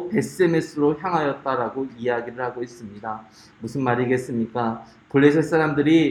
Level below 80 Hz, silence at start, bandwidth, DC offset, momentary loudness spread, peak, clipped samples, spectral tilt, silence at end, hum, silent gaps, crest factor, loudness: -60 dBFS; 0 s; 13 kHz; under 0.1%; 16 LU; -4 dBFS; under 0.1%; -7 dB/octave; 0 s; none; none; 18 dB; -22 LUFS